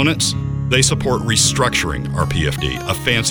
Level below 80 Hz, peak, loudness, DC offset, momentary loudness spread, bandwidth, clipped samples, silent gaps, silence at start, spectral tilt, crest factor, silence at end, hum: -32 dBFS; 0 dBFS; -17 LUFS; under 0.1%; 7 LU; over 20 kHz; under 0.1%; none; 0 s; -3.5 dB/octave; 16 dB; 0 s; none